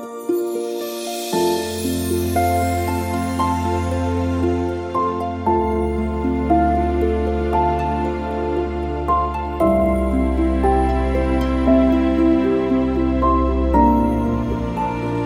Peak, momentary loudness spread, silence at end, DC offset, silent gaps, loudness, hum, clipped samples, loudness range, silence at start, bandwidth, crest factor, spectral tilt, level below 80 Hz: -2 dBFS; 6 LU; 0 s; under 0.1%; none; -19 LUFS; none; under 0.1%; 4 LU; 0 s; 17 kHz; 16 dB; -7 dB/octave; -26 dBFS